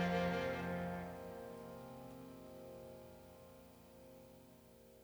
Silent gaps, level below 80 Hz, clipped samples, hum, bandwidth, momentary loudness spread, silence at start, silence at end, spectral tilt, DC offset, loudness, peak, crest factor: none; -68 dBFS; under 0.1%; none; over 20 kHz; 21 LU; 0 s; 0 s; -6.5 dB/octave; under 0.1%; -45 LUFS; -26 dBFS; 20 dB